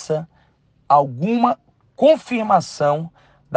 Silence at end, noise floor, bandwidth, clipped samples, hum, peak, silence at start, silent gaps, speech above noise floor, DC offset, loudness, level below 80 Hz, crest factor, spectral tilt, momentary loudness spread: 0 s; -58 dBFS; 9.4 kHz; under 0.1%; none; 0 dBFS; 0 s; none; 41 dB; under 0.1%; -18 LUFS; -64 dBFS; 18 dB; -6.5 dB/octave; 10 LU